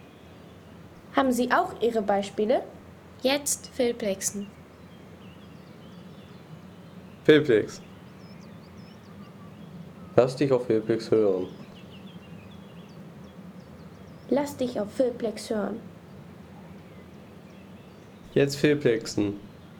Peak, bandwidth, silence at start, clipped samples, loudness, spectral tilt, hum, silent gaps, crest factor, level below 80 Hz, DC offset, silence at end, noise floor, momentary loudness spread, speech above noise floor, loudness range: -6 dBFS; 18.5 kHz; 0.25 s; under 0.1%; -26 LUFS; -5 dB/octave; none; none; 22 dB; -62 dBFS; under 0.1%; 0 s; -48 dBFS; 24 LU; 23 dB; 7 LU